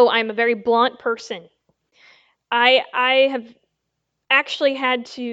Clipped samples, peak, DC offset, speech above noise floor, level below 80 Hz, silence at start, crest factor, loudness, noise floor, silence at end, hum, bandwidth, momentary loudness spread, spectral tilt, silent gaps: under 0.1%; -2 dBFS; under 0.1%; 58 dB; -74 dBFS; 0 s; 20 dB; -18 LUFS; -77 dBFS; 0 s; none; 8 kHz; 12 LU; -3 dB/octave; none